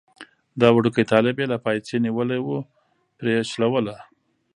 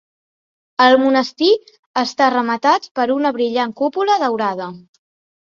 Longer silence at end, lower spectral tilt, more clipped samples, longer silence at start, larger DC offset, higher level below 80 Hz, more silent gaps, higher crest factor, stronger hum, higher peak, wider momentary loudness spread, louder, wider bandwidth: second, 0.55 s vs 0.7 s; first, -6.5 dB/octave vs -4 dB/octave; neither; second, 0.2 s vs 0.8 s; neither; about the same, -64 dBFS vs -66 dBFS; second, none vs 1.79-1.94 s, 2.91-2.95 s; first, 22 dB vs 16 dB; neither; about the same, 0 dBFS vs -2 dBFS; first, 13 LU vs 9 LU; second, -22 LUFS vs -16 LUFS; first, 10.5 kHz vs 7.4 kHz